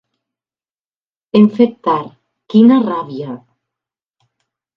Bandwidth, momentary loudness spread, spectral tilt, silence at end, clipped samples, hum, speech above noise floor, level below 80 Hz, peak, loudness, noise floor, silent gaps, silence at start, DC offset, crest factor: 5.4 kHz; 18 LU; -9.5 dB/octave; 1.4 s; under 0.1%; none; over 78 dB; -64 dBFS; 0 dBFS; -13 LUFS; under -90 dBFS; none; 1.35 s; under 0.1%; 16 dB